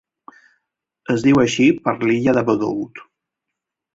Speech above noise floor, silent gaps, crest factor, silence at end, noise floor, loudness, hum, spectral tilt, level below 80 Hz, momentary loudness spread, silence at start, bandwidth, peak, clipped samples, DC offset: 65 dB; none; 18 dB; 0.95 s; -82 dBFS; -17 LUFS; none; -6 dB/octave; -54 dBFS; 12 LU; 1.1 s; 7.8 kHz; -2 dBFS; under 0.1%; under 0.1%